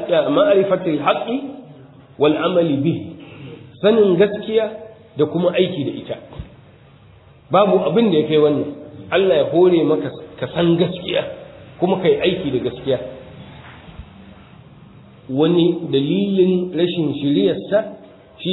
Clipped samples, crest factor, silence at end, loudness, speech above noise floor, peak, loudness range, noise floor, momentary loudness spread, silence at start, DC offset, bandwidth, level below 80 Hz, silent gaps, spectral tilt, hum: under 0.1%; 16 dB; 0 s; -18 LUFS; 30 dB; -2 dBFS; 6 LU; -46 dBFS; 21 LU; 0 s; under 0.1%; 4.1 kHz; -52 dBFS; none; -10 dB/octave; none